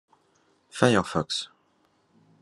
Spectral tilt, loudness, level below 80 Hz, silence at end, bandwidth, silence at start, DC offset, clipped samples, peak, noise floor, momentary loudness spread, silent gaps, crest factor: -5 dB/octave; -25 LUFS; -66 dBFS; 0.95 s; 12.5 kHz; 0.75 s; under 0.1%; under 0.1%; -2 dBFS; -67 dBFS; 20 LU; none; 26 dB